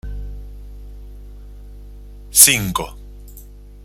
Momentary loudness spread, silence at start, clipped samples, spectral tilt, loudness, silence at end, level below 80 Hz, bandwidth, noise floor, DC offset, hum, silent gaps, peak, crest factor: 26 LU; 0.05 s; 0.1%; -1 dB/octave; -12 LUFS; 0 s; -34 dBFS; 16.5 kHz; -39 dBFS; under 0.1%; 50 Hz at -35 dBFS; none; 0 dBFS; 22 dB